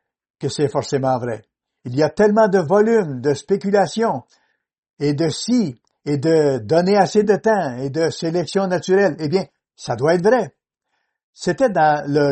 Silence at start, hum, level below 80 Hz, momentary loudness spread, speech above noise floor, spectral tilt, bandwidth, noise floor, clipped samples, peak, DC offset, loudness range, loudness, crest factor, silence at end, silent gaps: 0.4 s; none; -58 dBFS; 11 LU; 56 dB; -6 dB/octave; 8.8 kHz; -73 dBFS; under 0.1%; -2 dBFS; under 0.1%; 2 LU; -18 LUFS; 18 dB; 0 s; 4.78-4.83 s, 4.90-4.94 s, 11.23-11.33 s